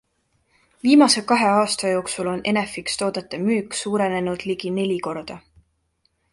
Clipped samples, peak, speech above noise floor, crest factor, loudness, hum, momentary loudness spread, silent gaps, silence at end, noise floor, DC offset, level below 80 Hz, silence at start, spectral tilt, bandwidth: under 0.1%; -2 dBFS; 48 dB; 20 dB; -21 LUFS; none; 11 LU; none; 0.95 s; -69 dBFS; under 0.1%; -60 dBFS; 0.85 s; -4 dB/octave; 11.5 kHz